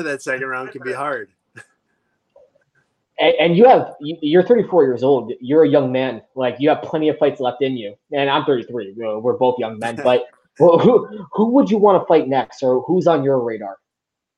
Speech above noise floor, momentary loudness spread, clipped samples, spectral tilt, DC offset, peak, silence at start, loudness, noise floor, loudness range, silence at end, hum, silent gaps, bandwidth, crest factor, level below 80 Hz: 66 dB; 13 LU; under 0.1%; -7 dB/octave; under 0.1%; -2 dBFS; 0 s; -17 LUFS; -82 dBFS; 5 LU; 0.6 s; none; none; 10.5 kHz; 16 dB; -64 dBFS